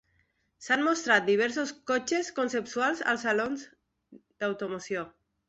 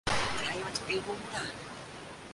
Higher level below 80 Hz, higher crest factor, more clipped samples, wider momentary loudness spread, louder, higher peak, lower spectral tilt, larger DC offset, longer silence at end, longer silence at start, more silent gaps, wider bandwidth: second, -72 dBFS vs -54 dBFS; about the same, 22 dB vs 20 dB; neither; about the same, 12 LU vs 13 LU; first, -28 LUFS vs -35 LUFS; first, -8 dBFS vs -16 dBFS; about the same, -3 dB/octave vs -3 dB/octave; neither; first, 0.4 s vs 0 s; first, 0.6 s vs 0.05 s; neither; second, 8.2 kHz vs 11.5 kHz